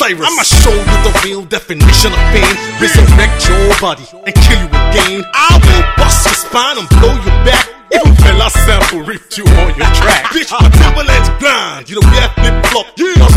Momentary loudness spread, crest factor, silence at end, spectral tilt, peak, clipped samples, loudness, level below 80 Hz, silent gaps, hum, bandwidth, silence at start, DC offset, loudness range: 6 LU; 8 dB; 0 s; -4 dB/octave; 0 dBFS; 3%; -9 LUFS; -10 dBFS; none; none; 16 kHz; 0 s; under 0.1%; 1 LU